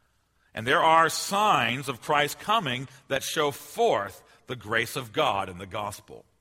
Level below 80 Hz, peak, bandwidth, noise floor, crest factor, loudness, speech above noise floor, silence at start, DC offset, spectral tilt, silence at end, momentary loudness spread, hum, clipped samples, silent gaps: -64 dBFS; -6 dBFS; 16 kHz; -68 dBFS; 22 dB; -25 LUFS; 41 dB; 0.55 s; under 0.1%; -3 dB/octave; 0.2 s; 14 LU; none; under 0.1%; none